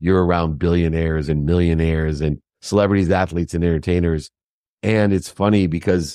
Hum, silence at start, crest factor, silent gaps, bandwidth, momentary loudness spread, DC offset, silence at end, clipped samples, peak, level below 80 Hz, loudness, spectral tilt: none; 0 s; 16 dB; 4.43-4.77 s; 12.5 kHz; 5 LU; under 0.1%; 0 s; under 0.1%; -2 dBFS; -32 dBFS; -19 LUFS; -7.5 dB/octave